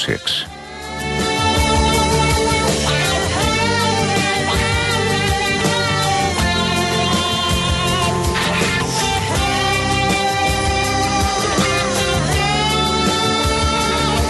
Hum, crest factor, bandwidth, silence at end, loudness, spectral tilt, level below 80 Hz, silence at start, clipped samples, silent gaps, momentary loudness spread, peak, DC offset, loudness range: none; 14 dB; 12.5 kHz; 0 s; -16 LUFS; -3.5 dB/octave; -28 dBFS; 0 s; under 0.1%; none; 2 LU; -2 dBFS; under 0.1%; 1 LU